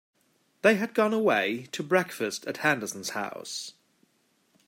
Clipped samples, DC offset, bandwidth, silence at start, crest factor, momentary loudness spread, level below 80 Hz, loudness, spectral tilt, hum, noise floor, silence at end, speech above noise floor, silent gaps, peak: under 0.1%; under 0.1%; 16 kHz; 0.65 s; 22 dB; 12 LU; -80 dBFS; -27 LUFS; -4 dB/octave; none; -70 dBFS; 0.95 s; 42 dB; none; -8 dBFS